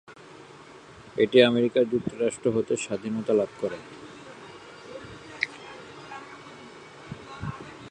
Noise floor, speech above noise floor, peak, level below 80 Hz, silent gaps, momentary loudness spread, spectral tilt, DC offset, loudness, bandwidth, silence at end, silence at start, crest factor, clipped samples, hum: -48 dBFS; 24 dB; -4 dBFS; -60 dBFS; none; 25 LU; -5 dB/octave; under 0.1%; -26 LUFS; 10 kHz; 0 s; 0.1 s; 24 dB; under 0.1%; none